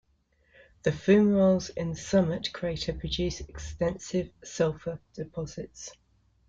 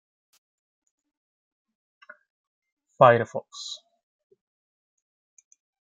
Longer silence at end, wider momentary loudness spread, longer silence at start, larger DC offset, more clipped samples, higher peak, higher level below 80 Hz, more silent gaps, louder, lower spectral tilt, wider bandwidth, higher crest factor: second, 0.55 s vs 2.15 s; about the same, 17 LU vs 19 LU; second, 0.85 s vs 3 s; neither; neither; second, -10 dBFS vs -2 dBFS; first, -48 dBFS vs -78 dBFS; neither; second, -28 LUFS vs -22 LUFS; about the same, -6 dB/octave vs -5.5 dB/octave; about the same, 7.8 kHz vs 7.8 kHz; second, 18 dB vs 28 dB